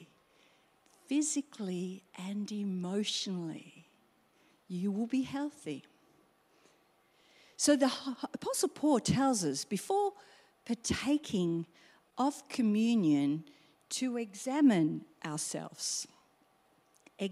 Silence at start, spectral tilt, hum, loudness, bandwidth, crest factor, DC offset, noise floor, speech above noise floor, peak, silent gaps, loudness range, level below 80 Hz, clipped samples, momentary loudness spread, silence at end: 0 s; -4.5 dB/octave; none; -33 LUFS; 15 kHz; 20 dB; under 0.1%; -69 dBFS; 37 dB; -14 dBFS; none; 7 LU; -68 dBFS; under 0.1%; 14 LU; 0 s